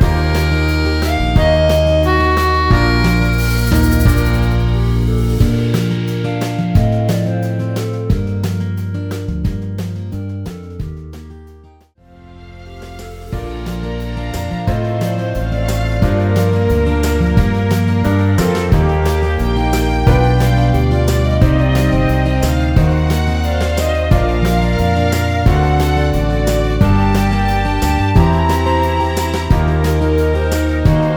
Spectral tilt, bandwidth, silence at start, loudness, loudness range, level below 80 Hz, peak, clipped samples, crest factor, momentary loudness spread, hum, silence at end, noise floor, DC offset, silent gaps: -6.5 dB/octave; over 20 kHz; 0 s; -15 LUFS; 11 LU; -20 dBFS; 0 dBFS; under 0.1%; 14 dB; 10 LU; none; 0 s; -45 dBFS; under 0.1%; none